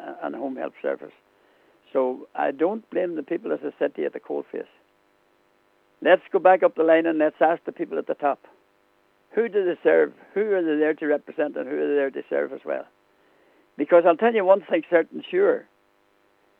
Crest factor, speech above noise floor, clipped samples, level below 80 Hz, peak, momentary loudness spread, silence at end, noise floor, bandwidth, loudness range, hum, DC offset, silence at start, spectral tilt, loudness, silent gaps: 20 dB; 41 dB; under 0.1%; -86 dBFS; -4 dBFS; 13 LU; 0.95 s; -64 dBFS; 4 kHz; 7 LU; none; under 0.1%; 0 s; -8 dB/octave; -23 LUFS; none